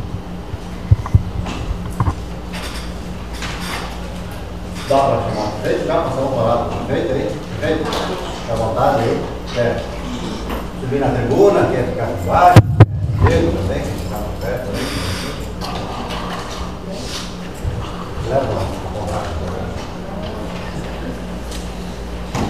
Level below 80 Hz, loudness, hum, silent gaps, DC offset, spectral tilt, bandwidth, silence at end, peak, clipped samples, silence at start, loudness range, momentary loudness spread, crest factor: -30 dBFS; -19 LUFS; none; none; 2%; -6.5 dB/octave; 15 kHz; 0 s; 0 dBFS; 0.1%; 0 s; 11 LU; 14 LU; 18 dB